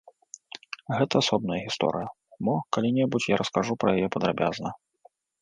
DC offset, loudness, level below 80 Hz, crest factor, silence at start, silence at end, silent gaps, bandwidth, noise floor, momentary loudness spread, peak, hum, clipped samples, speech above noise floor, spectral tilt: under 0.1%; -26 LUFS; -60 dBFS; 20 dB; 0.7 s; 0.65 s; none; 10 kHz; -61 dBFS; 15 LU; -8 dBFS; none; under 0.1%; 35 dB; -5.5 dB/octave